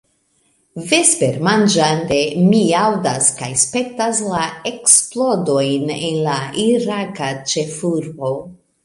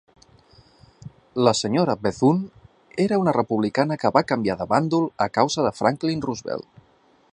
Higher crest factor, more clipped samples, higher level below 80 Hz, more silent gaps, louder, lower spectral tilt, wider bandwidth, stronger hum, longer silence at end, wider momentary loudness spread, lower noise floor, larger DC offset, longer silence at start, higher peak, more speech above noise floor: about the same, 18 dB vs 22 dB; neither; about the same, -56 dBFS vs -58 dBFS; neither; first, -16 LUFS vs -22 LUFS; second, -3.5 dB/octave vs -5.5 dB/octave; first, 16 kHz vs 11 kHz; neither; second, 0.3 s vs 0.7 s; about the same, 11 LU vs 9 LU; about the same, -61 dBFS vs -58 dBFS; neither; second, 0.75 s vs 1.05 s; about the same, 0 dBFS vs -2 dBFS; first, 45 dB vs 37 dB